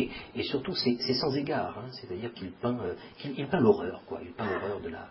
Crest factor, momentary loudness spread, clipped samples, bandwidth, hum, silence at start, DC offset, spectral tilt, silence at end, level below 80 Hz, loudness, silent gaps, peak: 22 dB; 14 LU; under 0.1%; 5.8 kHz; none; 0 s; under 0.1%; -9 dB/octave; 0 s; -58 dBFS; -31 LUFS; none; -10 dBFS